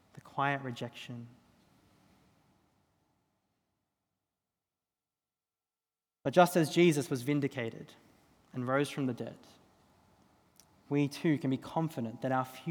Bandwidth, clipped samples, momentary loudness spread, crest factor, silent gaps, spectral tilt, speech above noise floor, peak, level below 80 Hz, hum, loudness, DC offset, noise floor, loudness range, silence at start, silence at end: over 20 kHz; under 0.1%; 18 LU; 26 dB; none; -6 dB/octave; over 58 dB; -10 dBFS; -80 dBFS; none; -32 LUFS; under 0.1%; under -90 dBFS; 10 LU; 0.15 s; 0 s